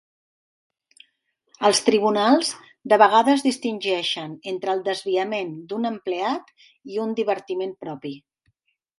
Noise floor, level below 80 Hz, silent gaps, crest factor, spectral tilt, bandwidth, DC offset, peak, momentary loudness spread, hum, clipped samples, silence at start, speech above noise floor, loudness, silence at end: -70 dBFS; -74 dBFS; none; 20 dB; -3.5 dB/octave; 11.5 kHz; under 0.1%; -2 dBFS; 14 LU; none; under 0.1%; 1.6 s; 48 dB; -22 LUFS; 0.8 s